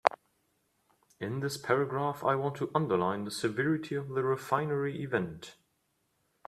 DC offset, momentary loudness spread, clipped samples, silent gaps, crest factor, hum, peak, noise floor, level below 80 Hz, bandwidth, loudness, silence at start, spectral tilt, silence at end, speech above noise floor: under 0.1%; 7 LU; under 0.1%; none; 28 dB; none; -4 dBFS; -76 dBFS; -72 dBFS; 14 kHz; -32 LUFS; 0.05 s; -6 dB/octave; 0.95 s; 45 dB